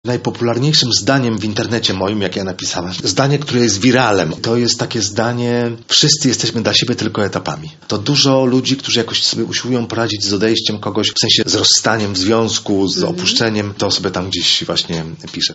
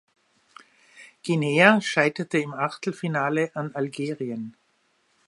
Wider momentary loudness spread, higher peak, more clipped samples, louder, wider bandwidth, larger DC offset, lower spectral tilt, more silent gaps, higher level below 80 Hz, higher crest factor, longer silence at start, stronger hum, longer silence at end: second, 8 LU vs 15 LU; about the same, 0 dBFS vs 0 dBFS; neither; first, -14 LUFS vs -24 LUFS; second, 8.2 kHz vs 11.5 kHz; neither; second, -3.5 dB/octave vs -5.5 dB/octave; neither; first, -50 dBFS vs -76 dBFS; second, 16 dB vs 26 dB; second, 0.05 s vs 0.95 s; neither; second, 0 s vs 0.8 s